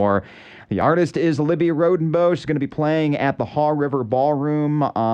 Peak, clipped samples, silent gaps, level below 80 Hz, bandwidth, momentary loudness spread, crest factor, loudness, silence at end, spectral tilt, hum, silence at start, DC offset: -6 dBFS; under 0.1%; none; -56 dBFS; 9.2 kHz; 4 LU; 14 dB; -20 LUFS; 0 s; -8 dB/octave; none; 0 s; under 0.1%